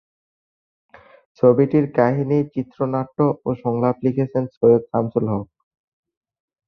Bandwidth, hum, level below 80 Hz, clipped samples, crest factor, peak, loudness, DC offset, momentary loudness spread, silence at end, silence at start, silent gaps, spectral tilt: 5.6 kHz; none; -58 dBFS; under 0.1%; 18 dB; -2 dBFS; -20 LUFS; under 0.1%; 8 LU; 1.25 s; 1.45 s; 4.57-4.61 s; -11.5 dB/octave